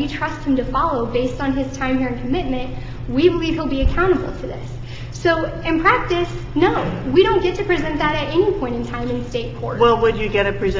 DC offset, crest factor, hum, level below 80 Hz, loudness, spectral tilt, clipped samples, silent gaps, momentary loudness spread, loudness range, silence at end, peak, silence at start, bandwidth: under 0.1%; 18 dB; none; -30 dBFS; -19 LUFS; -6.5 dB/octave; under 0.1%; none; 10 LU; 3 LU; 0 s; -2 dBFS; 0 s; 7.6 kHz